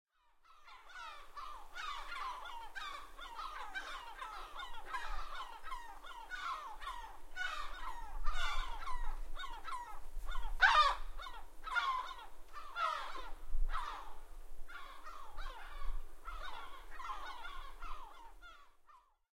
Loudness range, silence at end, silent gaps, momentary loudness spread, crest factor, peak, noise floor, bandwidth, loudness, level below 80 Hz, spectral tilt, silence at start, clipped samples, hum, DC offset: 14 LU; 0.4 s; none; 14 LU; 24 dB; -14 dBFS; -66 dBFS; 12.5 kHz; -42 LUFS; -46 dBFS; -2 dB/octave; 0.5 s; under 0.1%; none; under 0.1%